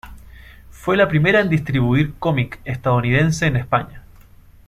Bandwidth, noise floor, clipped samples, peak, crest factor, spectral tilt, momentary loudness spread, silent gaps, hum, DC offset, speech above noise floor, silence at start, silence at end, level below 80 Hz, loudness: 13.5 kHz; -45 dBFS; under 0.1%; -2 dBFS; 16 dB; -6.5 dB/octave; 9 LU; none; none; under 0.1%; 28 dB; 0.05 s; 0.7 s; -40 dBFS; -18 LUFS